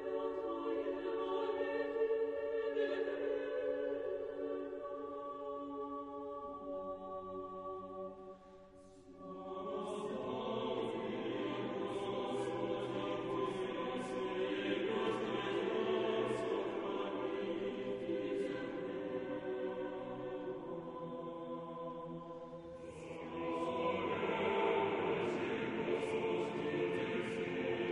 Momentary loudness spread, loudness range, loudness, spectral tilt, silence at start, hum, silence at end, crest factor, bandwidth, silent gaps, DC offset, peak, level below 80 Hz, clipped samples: 10 LU; 9 LU; -40 LUFS; -6 dB/octave; 0 s; none; 0 s; 18 dB; 10.5 kHz; none; under 0.1%; -22 dBFS; -72 dBFS; under 0.1%